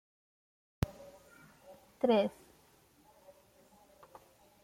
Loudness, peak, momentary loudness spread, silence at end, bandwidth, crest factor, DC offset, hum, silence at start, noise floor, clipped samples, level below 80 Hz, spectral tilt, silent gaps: -34 LUFS; -16 dBFS; 29 LU; 2.35 s; 16.5 kHz; 24 dB; under 0.1%; none; 0.8 s; -66 dBFS; under 0.1%; -62 dBFS; -7 dB/octave; none